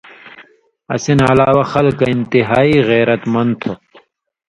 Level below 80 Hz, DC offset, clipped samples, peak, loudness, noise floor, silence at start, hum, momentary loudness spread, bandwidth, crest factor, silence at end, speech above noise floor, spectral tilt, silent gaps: -44 dBFS; under 0.1%; under 0.1%; 0 dBFS; -13 LUFS; -48 dBFS; 0.25 s; none; 11 LU; 11 kHz; 14 dB; 0.75 s; 36 dB; -6.5 dB/octave; none